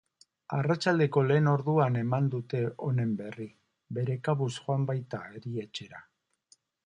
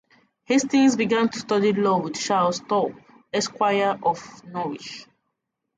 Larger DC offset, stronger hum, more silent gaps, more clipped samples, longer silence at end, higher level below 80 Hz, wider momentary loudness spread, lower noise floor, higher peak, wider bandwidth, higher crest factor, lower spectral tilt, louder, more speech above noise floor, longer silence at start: neither; neither; neither; neither; about the same, 0.85 s vs 0.75 s; about the same, -70 dBFS vs -68 dBFS; about the same, 15 LU vs 13 LU; second, -66 dBFS vs -79 dBFS; second, -12 dBFS vs -8 dBFS; about the same, 10 kHz vs 9.4 kHz; about the same, 18 dB vs 16 dB; first, -7.5 dB/octave vs -4.5 dB/octave; second, -29 LUFS vs -23 LUFS; second, 38 dB vs 57 dB; about the same, 0.5 s vs 0.5 s